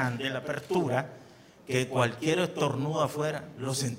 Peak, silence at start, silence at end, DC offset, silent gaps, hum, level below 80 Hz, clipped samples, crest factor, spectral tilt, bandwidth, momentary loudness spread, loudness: -10 dBFS; 0 s; 0 s; under 0.1%; none; none; -68 dBFS; under 0.1%; 20 dB; -5 dB/octave; 16 kHz; 6 LU; -30 LUFS